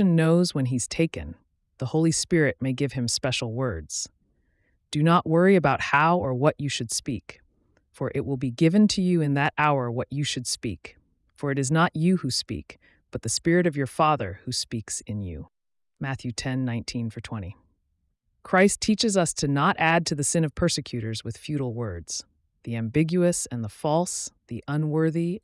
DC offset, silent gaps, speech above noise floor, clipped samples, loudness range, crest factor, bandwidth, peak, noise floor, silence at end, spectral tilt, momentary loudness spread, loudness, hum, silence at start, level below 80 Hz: under 0.1%; none; 49 dB; under 0.1%; 5 LU; 16 dB; 12 kHz; -8 dBFS; -73 dBFS; 0.05 s; -5 dB/octave; 13 LU; -25 LUFS; none; 0 s; -54 dBFS